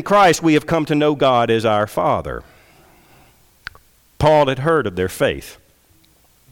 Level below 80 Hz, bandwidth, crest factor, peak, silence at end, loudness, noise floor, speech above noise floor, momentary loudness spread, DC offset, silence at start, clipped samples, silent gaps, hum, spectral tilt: -44 dBFS; 18.5 kHz; 14 dB; -6 dBFS; 1 s; -16 LUFS; -54 dBFS; 38 dB; 23 LU; under 0.1%; 0 s; under 0.1%; none; none; -5.5 dB/octave